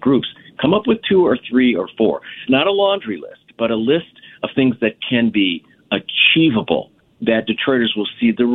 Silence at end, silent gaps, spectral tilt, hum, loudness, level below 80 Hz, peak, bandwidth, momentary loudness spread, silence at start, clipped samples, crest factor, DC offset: 0 s; none; -9 dB/octave; none; -17 LUFS; -54 dBFS; 0 dBFS; 4.1 kHz; 9 LU; 0 s; under 0.1%; 16 dB; under 0.1%